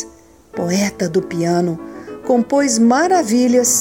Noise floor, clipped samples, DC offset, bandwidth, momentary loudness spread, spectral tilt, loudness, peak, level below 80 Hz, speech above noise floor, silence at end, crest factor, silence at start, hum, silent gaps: -42 dBFS; under 0.1%; 0.1%; 17 kHz; 16 LU; -4.5 dB/octave; -16 LUFS; -2 dBFS; -54 dBFS; 28 dB; 0 s; 14 dB; 0 s; none; none